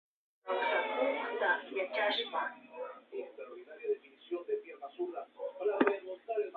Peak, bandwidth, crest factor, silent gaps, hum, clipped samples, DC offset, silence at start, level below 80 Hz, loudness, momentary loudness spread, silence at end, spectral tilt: -14 dBFS; 4.8 kHz; 22 dB; none; 60 Hz at -70 dBFS; under 0.1%; under 0.1%; 0.45 s; -88 dBFS; -36 LUFS; 14 LU; 0 s; 0.5 dB/octave